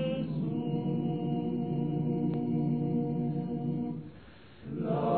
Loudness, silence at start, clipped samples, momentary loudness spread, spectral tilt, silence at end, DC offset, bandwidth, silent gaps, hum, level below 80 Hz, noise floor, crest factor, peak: -33 LUFS; 0 s; under 0.1%; 9 LU; -12 dB/octave; 0 s; 0.1%; 4.5 kHz; none; none; -62 dBFS; -53 dBFS; 14 dB; -16 dBFS